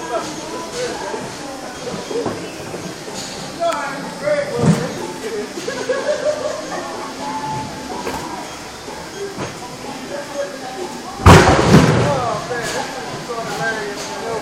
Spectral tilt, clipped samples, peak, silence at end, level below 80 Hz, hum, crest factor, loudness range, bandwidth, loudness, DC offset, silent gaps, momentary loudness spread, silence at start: -5 dB/octave; 0.1%; 0 dBFS; 0 s; -36 dBFS; none; 20 dB; 12 LU; 16 kHz; -19 LUFS; under 0.1%; none; 17 LU; 0 s